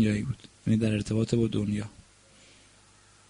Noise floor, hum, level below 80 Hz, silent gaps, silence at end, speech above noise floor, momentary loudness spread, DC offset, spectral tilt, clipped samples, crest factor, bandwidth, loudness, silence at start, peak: -58 dBFS; none; -52 dBFS; none; 1.4 s; 31 dB; 9 LU; under 0.1%; -7 dB/octave; under 0.1%; 18 dB; 10.5 kHz; -28 LUFS; 0 s; -12 dBFS